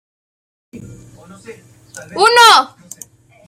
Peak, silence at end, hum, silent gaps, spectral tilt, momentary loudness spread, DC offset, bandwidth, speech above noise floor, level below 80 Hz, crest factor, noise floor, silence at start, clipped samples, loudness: 0 dBFS; 0.8 s; none; none; -1 dB/octave; 23 LU; under 0.1%; 16.5 kHz; 29 dB; -58 dBFS; 16 dB; -41 dBFS; 0.75 s; under 0.1%; -9 LUFS